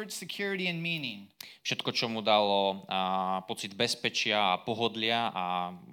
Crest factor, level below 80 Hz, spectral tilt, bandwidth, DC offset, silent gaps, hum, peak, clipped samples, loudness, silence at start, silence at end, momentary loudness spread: 20 dB; -78 dBFS; -3.5 dB/octave; 17.5 kHz; under 0.1%; none; none; -10 dBFS; under 0.1%; -30 LUFS; 0 s; 0 s; 10 LU